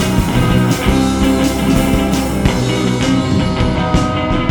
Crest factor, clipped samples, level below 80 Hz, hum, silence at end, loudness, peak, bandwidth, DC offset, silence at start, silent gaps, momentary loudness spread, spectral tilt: 14 dB; under 0.1%; -22 dBFS; none; 0 s; -14 LUFS; 0 dBFS; over 20 kHz; under 0.1%; 0 s; none; 2 LU; -6 dB/octave